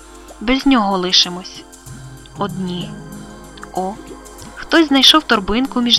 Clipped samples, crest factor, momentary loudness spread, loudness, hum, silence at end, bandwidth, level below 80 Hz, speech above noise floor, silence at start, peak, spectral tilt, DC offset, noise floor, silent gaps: under 0.1%; 18 dB; 26 LU; -14 LUFS; none; 0 s; 17 kHz; -40 dBFS; 20 dB; 0.1 s; 0 dBFS; -3 dB/octave; under 0.1%; -35 dBFS; none